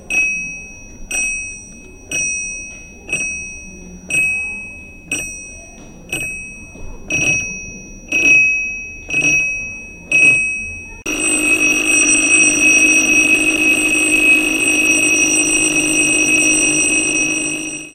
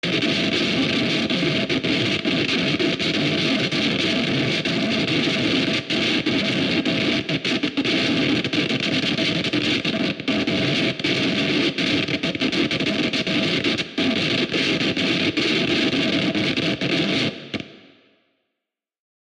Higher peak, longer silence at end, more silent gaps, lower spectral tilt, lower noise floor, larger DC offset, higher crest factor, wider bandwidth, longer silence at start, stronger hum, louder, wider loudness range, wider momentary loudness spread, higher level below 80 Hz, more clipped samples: first, 0 dBFS vs -8 dBFS; second, 0.05 s vs 1.5 s; neither; second, -1 dB/octave vs -4.5 dB/octave; second, -36 dBFS vs -83 dBFS; neither; about the same, 16 dB vs 14 dB; first, 14.5 kHz vs 11 kHz; about the same, 0 s vs 0.05 s; neither; first, -13 LUFS vs -20 LUFS; first, 11 LU vs 1 LU; first, 19 LU vs 2 LU; first, -40 dBFS vs -54 dBFS; neither